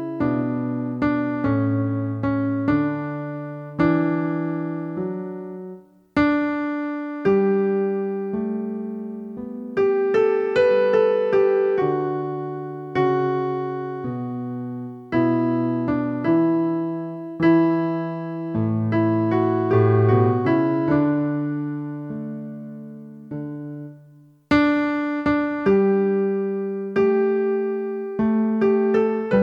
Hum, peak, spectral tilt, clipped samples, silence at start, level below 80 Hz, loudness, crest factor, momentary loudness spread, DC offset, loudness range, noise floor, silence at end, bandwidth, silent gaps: none; -6 dBFS; -9.5 dB/octave; under 0.1%; 0 s; -54 dBFS; -22 LUFS; 16 dB; 14 LU; under 0.1%; 5 LU; -50 dBFS; 0 s; 6.2 kHz; none